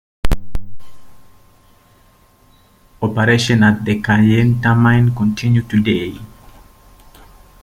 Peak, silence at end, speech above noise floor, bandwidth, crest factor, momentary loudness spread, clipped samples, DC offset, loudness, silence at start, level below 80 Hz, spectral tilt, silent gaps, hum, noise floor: -2 dBFS; 1.35 s; 37 dB; 15 kHz; 14 dB; 13 LU; under 0.1%; under 0.1%; -15 LUFS; 0.25 s; -32 dBFS; -6.5 dB/octave; none; none; -51 dBFS